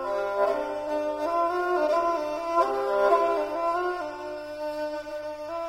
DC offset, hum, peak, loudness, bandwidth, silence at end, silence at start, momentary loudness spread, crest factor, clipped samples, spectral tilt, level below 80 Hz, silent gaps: under 0.1%; none; -10 dBFS; -27 LUFS; 16 kHz; 0 s; 0 s; 11 LU; 16 dB; under 0.1%; -4.5 dB/octave; -60 dBFS; none